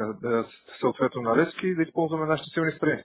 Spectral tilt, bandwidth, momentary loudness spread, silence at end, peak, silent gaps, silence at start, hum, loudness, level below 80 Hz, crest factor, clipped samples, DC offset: -10.5 dB/octave; 4 kHz; 5 LU; 0 s; -8 dBFS; none; 0 s; none; -26 LUFS; -64 dBFS; 18 dB; under 0.1%; under 0.1%